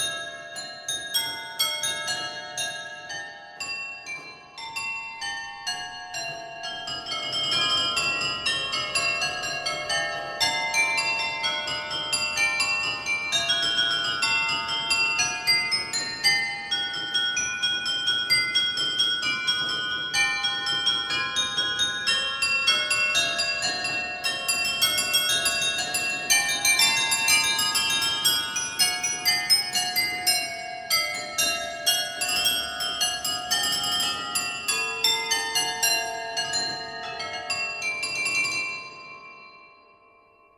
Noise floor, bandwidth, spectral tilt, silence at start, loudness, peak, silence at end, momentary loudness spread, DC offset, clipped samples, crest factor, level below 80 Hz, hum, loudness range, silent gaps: -57 dBFS; 16 kHz; 0.5 dB/octave; 0 s; -23 LUFS; -6 dBFS; 0.9 s; 11 LU; under 0.1%; under 0.1%; 20 dB; -60 dBFS; none; 8 LU; none